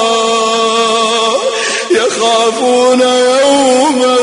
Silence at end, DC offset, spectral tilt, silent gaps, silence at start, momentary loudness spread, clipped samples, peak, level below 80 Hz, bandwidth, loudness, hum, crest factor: 0 s; under 0.1%; -1.5 dB/octave; none; 0 s; 3 LU; under 0.1%; 0 dBFS; -56 dBFS; 11 kHz; -10 LUFS; none; 10 dB